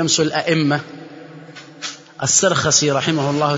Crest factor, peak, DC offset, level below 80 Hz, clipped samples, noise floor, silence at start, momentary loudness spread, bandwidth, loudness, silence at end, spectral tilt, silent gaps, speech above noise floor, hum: 18 dB; 0 dBFS; under 0.1%; -56 dBFS; under 0.1%; -38 dBFS; 0 s; 23 LU; 8 kHz; -16 LUFS; 0 s; -3 dB/octave; none; 21 dB; none